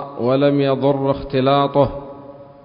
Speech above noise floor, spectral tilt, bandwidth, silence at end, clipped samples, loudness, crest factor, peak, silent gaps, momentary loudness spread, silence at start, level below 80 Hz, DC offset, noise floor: 22 dB; -12.5 dB/octave; 5.4 kHz; 0.2 s; under 0.1%; -17 LUFS; 16 dB; -2 dBFS; none; 16 LU; 0 s; -44 dBFS; under 0.1%; -39 dBFS